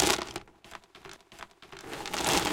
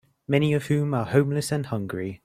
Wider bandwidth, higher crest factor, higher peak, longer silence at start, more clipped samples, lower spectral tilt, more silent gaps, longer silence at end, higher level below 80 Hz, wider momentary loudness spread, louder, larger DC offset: about the same, 17 kHz vs 15.5 kHz; first, 26 dB vs 18 dB; about the same, -6 dBFS vs -6 dBFS; second, 0 s vs 0.3 s; neither; second, -2 dB/octave vs -6.5 dB/octave; neither; about the same, 0 s vs 0.1 s; first, -52 dBFS vs -58 dBFS; first, 22 LU vs 7 LU; second, -31 LUFS vs -25 LUFS; neither